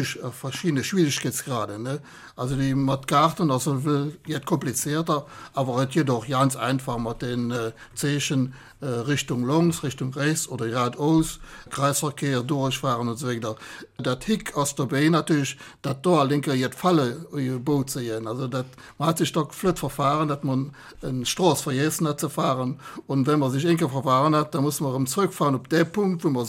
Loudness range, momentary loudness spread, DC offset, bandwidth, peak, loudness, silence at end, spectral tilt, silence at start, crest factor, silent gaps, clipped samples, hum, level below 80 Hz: 3 LU; 9 LU; under 0.1%; 16.5 kHz; -6 dBFS; -24 LUFS; 0 s; -5.5 dB/octave; 0 s; 18 dB; none; under 0.1%; none; -52 dBFS